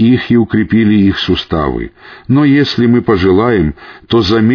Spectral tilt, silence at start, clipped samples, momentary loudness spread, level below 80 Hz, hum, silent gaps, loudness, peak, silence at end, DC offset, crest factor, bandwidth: -8 dB/octave; 0 s; under 0.1%; 8 LU; -32 dBFS; none; none; -11 LUFS; 0 dBFS; 0 s; under 0.1%; 10 dB; 5.4 kHz